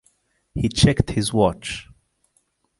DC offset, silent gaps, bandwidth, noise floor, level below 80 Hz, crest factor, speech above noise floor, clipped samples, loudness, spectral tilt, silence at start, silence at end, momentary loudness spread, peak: under 0.1%; none; 11.5 kHz; -67 dBFS; -38 dBFS; 20 dB; 48 dB; under 0.1%; -21 LUFS; -5.5 dB/octave; 0.55 s; 0.95 s; 15 LU; -2 dBFS